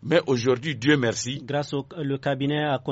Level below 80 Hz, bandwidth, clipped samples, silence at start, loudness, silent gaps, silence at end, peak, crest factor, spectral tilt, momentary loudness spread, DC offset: -60 dBFS; 8 kHz; under 0.1%; 0 s; -25 LUFS; none; 0 s; -8 dBFS; 18 dB; -4.5 dB/octave; 8 LU; under 0.1%